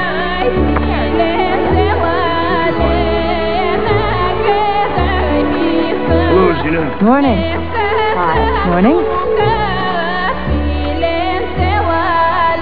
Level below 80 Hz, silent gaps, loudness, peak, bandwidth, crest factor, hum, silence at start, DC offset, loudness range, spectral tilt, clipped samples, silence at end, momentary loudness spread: -24 dBFS; none; -14 LUFS; 0 dBFS; 5.2 kHz; 14 dB; none; 0 s; 6%; 2 LU; -9.5 dB/octave; under 0.1%; 0 s; 5 LU